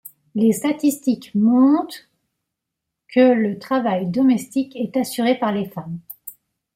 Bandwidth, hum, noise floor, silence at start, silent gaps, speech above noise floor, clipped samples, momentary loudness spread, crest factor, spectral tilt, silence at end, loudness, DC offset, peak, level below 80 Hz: 16.5 kHz; none; -81 dBFS; 0.05 s; none; 63 dB; under 0.1%; 17 LU; 16 dB; -6 dB/octave; 0.45 s; -19 LUFS; under 0.1%; -4 dBFS; -66 dBFS